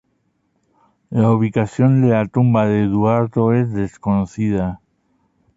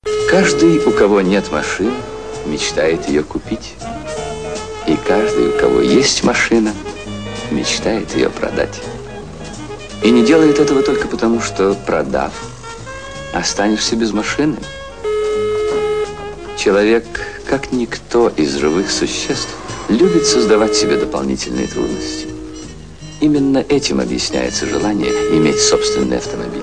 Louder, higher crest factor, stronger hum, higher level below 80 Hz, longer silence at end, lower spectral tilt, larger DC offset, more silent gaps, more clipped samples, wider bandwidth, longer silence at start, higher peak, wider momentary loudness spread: about the same, -17 LUFS vs -15 LUFS; about the same, 14 dB vs 16 dB; neither; second, -46 dBFS vs -38 dBFS; first, 0.8 s vs 0 s; first, -9.5 dB/octave vs -4 dB/octave; second, under 0.1% vs 0.8%; neither; neither; second, 7.8 kHz vs 10.5 kHz; first, 1.1 s vs 0.05 s; second, -4 dBFS vs 0 dBFS; second, 7 LU vs 16 LU